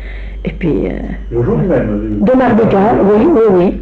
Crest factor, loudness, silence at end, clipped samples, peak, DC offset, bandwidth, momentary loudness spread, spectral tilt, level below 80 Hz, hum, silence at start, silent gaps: 8 dB; -11 LUFS; 0 s; under 0.1%; -2 dBFS; under 0.1%; 5.6 kHz; 13 LU; -10 dB/octave; -26 dBFS; none; 0 s; none